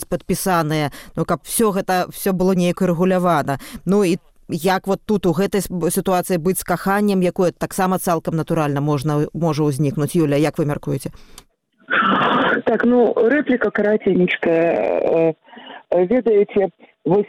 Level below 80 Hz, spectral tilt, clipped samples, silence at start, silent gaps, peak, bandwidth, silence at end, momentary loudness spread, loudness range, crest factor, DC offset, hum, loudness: -46 dBFS; -6 dB/octave; under 0.1%; 0 s; none; -4 dBFS; 17 kHz; 0 s; 7 LU; 3 LU; 14 dB; under 0.1%; none; -18 LUFS